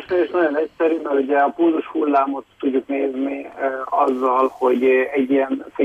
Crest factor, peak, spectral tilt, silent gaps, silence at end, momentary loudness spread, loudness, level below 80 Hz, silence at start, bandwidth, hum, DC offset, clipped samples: 12 dB; -6 dBFS; -6.5 dB/octave; none; 0 s; 8 LU; -19 LUFS; -64 dBFS; 0 s; 7.8 kHz; none; under 0.1%; under 0.1%